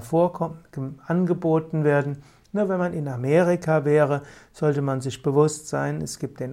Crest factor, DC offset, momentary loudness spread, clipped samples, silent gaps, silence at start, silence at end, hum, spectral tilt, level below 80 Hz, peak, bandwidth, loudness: 16 dB; under 0.1%; 11 LU; under 0.1%; none; 0 s; 0 s; none; -7 dB/octave; -58 dBFS; -6 dBFS; 14.5 kHz; -23 LUFS